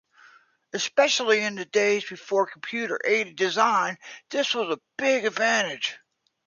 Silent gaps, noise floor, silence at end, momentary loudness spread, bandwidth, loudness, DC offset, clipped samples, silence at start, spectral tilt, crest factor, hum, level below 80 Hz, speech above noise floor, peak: none; -56 dBFS; 0.5 s; 9 LU; 7.4 kHz; -24 LUFS; under 0.1%; under 0.1%; 0.75 s; -2 dB/octave; 20 dB; none; -78 dBFS; 32 dB; -6 dBFS